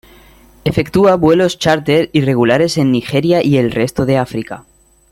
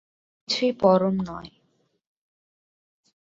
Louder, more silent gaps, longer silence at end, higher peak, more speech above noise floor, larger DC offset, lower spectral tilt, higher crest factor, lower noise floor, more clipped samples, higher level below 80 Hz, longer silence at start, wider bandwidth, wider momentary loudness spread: first, -13 LUFS vs -23 LUFS; neither; second, 0.5 s vs 1.75 s; first, 0 dBFS vs -4 dBFS; second, 31 dB vs 47 dB; neither; about the same, -6.5 dB/octave vs -6 dB/octave; second, 14 dB vs 22 dB; second, -44 dBFS vs -69 dBFS; neither; first, -42 dBFS vs -62 dBFS; first, 0.65 s vs 0.5 s; first, 16.5 kHz vs 7.8 kHz; second, 10 LU vs 14 LU